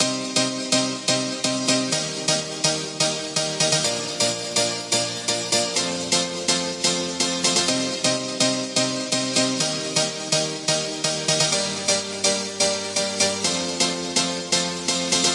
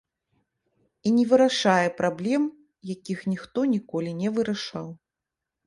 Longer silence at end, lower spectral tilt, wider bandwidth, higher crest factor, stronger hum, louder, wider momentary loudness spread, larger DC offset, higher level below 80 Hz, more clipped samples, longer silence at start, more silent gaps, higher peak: second, 0 s vs 0.7 s; second, -2 dB/octave vs -5.5 dB/octave; about the same, 11.5 kHz vs 11.5 kHz; about the same, 18 dB vs 20 dB; neither; first, -21 LUFS vs -25 LUFS; second, 3 LU vs 17 LU; neither; about the same, -66 dBFS vs -68 dBFS; neither; second, 0 s vs 1.05 s; neither; about the same, -4 dBFS vs -6 dBFS